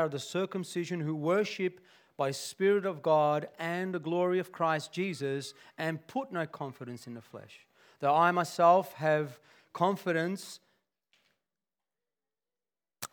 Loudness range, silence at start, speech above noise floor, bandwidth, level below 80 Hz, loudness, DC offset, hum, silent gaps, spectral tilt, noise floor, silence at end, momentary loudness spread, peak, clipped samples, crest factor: 8 LU; 0 s; over 59 dB; 20 kHz; -90 dBFS; -31 LUFS; under 0.1%; none; none; -5.5 dB/octave; under -90 dBFS; 0.05 s; 18 LU; -12 dBFS; under 0.1%; 20 dB